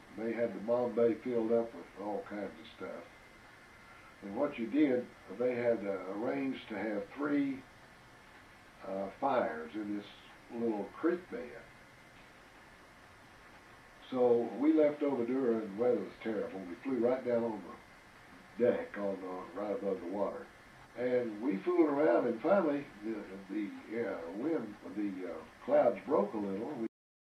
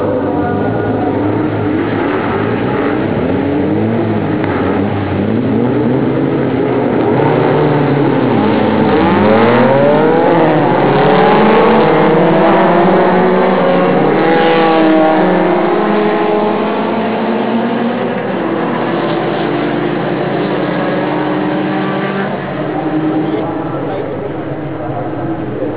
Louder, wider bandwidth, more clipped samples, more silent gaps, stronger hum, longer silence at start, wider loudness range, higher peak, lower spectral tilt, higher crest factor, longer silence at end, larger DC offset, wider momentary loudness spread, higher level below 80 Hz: second, -35 LUFS vs -12 LUFS; first, 11.5 kHz vs 4 kHz; neither; neither; neither; about the same, 0 s vs 0 s; about the same, 7 LU vs 6 LU; second, -16 dBFS vs 0 dBFS; second, -7.5 dB/octave vs -11 dB/octave; first, 20 dB vs 12 dB; first, 0.4 s vs 0 s; neither; first, 18 LU vs 8 LU; second, -72 dBFS vs -40 dBFS